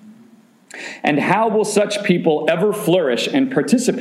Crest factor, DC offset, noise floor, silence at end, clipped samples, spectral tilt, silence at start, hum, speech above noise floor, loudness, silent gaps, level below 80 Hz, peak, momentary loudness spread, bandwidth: 16 dB; under 0.1%; -49 dBFS; 0 s; under 0.1%; -5 dB/octave; 0.05 s; none; 32 dB; -17 LUFS; none; -68 dBFS; -2 dBFS; 6 LU; 15.5 kHz